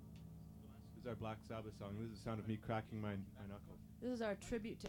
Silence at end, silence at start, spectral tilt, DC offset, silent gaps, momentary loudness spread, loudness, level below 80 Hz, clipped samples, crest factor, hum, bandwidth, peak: 0 s; 0 s; -6.5 dB/octave; under 0.1%; none; 14 LU; -48 LUFS; -64 dBFS; under 0.1%; 18 dB; none; 19 kHz; -30 dBFS